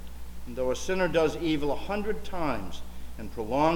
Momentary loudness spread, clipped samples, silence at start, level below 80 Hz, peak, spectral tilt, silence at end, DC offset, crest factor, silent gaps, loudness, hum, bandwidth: 17 LU; under 0.1%; 0 s; -42 dBFS; -12 dBFS; -5.5 dB/octave; 0 s; under 0.1%; 16 dB; none; -29 LUFS; none; 18 kHz